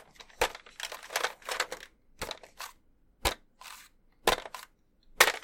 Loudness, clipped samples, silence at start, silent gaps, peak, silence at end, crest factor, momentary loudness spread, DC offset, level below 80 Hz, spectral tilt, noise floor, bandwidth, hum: -32 LUFS; under 0.1%; 0.2 s; none; -4 dBFS; 0.05 s; 32 dB; 18 LU; under 0.1%; -52 dBFS; -1 dB/octave; -64 dBFS; 17 kHz; none